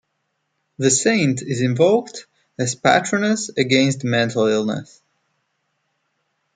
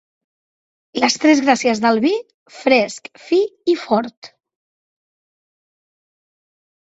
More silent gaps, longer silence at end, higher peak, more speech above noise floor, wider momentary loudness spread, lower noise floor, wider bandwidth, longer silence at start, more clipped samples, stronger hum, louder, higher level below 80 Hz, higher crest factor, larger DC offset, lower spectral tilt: second, none vs 2.34-2.46 s, 4.17-4.22 s; second, 1.75 s vs 2.55 s; about the same, 0 dBFS vs 0 dBFS; second, 54 dB vs over 73 dB; about the same, 9 LU vs 11 LU; second, -73 dBFS vs under -90 dBFS; first, 9.6 kHz vs 8.2 kHz; second, 0.8 s vs 0.95 s; neither; neither; about the same, -18 LUFS vs -17 LUFS; about the same, -62 dBFS vs -66 dBFS; about the same, 20 dB vs 20 dB; neither; about the same, -4 dB/octave vs -3.5 dB/octave